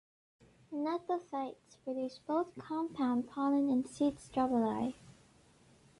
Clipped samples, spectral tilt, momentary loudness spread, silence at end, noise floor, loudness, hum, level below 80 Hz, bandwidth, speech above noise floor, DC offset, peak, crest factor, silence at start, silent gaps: under 0.1%; -6.5 dB/octave; 10 LU; 0.9 s; -64 dBFS; -36 LUFS; none; -70 dBFS; 11.5 kHz; 30 dB; under 0.1%; -20 dBFS; 16 dB; 0.7 s; none